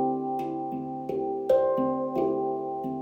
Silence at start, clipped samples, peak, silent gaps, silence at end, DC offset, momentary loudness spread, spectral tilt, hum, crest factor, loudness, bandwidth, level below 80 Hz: 0 s; under 0.1%; -12 dBFS; none; 0 s; under 0.1%; 9 LU; -9 dB/octave; none; 16 dB; -28 LUFS; 16 kHz; -64 dBFS